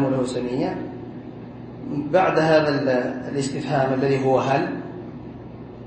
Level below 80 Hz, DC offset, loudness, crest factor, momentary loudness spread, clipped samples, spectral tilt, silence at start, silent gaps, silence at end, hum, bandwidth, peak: -54 dBFS; under 0.1%; -22 LUFS; 18 dB; 19 LU; under 0.1%; -6.5 dB/octave; 0 s; none; 0 s; none; 8.8 kHz; -6 dBFS